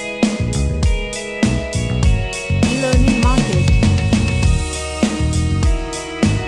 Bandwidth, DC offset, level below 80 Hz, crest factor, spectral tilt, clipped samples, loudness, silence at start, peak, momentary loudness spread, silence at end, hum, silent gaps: 12 kHz; 0.2%; -22 dBFS; 14 dB; -5.5 dB/octave; under 0.1%; -17 LUFS; 0 s; -2 dBFS; 6 LU; 0 s; none; none